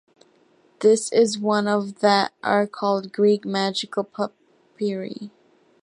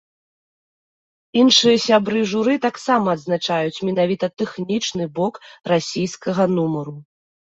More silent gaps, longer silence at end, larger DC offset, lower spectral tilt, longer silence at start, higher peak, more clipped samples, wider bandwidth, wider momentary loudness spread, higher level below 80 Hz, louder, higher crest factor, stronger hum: neither; about the same, 0.55 s vs 0.55 s; neither; about the same, -4.5 dB/octave vs -4.5 dB/octave; second, 0.8 s vs 1.35 s; second, -4 dBFS vs 0 dBFS; neither; first, 11.5 kHz vs 8 kHz; about the same, 11 LU vs 11 LU; second, -76 dBFS vs -62 dBFS; second, -22 LUFS vs -19 LUFS; about the same, 20 dB vs 20 dB; neither